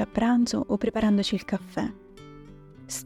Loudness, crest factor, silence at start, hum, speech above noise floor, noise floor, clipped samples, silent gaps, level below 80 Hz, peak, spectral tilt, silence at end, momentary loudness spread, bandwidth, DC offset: -26 LUFS; 16 dB; 0 s; none; 22 dB; -47 dBFS; under 0.1%; none; -50 dBFS; -10 dBFS; -5 dB/octave; 0 s; 22 LU; 15 kHz; under 0.1%